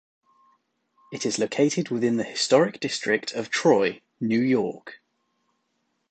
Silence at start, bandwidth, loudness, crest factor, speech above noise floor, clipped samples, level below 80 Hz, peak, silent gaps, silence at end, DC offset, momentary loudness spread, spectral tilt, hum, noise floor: 1.1 s; 9.2 kHz; -24 LUFS; 20 dB; 51 dB; under 0.1%; -72 dBFS; -6 dBFS; none; 1.15 s; under 0.1%; 11 LU; -4.5 dB/octave; none; -74 dBFS